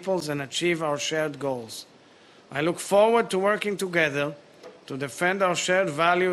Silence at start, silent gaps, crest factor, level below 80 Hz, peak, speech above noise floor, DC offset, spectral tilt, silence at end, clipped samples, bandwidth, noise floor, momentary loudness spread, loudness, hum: 0 s; none; 18 dB; -68 dBFS; -6 dBFS; 29 dB; under 0.1%; -4 dB/octave; 0 s; under 0.1%; 12.5 kHz; -53 dBFS; 13 LU; -25 LUFS; none